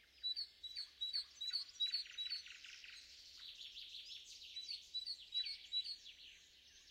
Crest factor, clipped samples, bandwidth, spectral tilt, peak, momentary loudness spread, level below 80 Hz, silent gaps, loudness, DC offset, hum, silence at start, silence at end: 18 dB; under 0.1%; 16 kHz; 2.5 dB/octave; -32 dBFS; 16 LU; -82 dBFS; none; -45 LUFS; under 0.1%; none; 0 s; 0 s